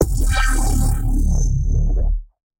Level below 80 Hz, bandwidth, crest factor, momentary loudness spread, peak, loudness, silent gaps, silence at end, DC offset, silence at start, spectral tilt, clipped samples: -18 dBFS; 17 kHz; 14 dB; 4 LU; -2 dBFS; -21 LUFS; none; 0.35 s; under 0.1%; 0 s; -5 dB/octave; under 0.1%